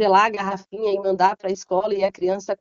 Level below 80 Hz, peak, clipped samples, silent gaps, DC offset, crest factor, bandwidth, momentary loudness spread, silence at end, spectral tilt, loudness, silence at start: -64 dBFS; -4 dBFS; under 0.1%; none; under 0.1%; 16 dB; 7.6 kHz; 9 LU; 0.05 s; -3 dB/octave; -22 LUFS; 0 s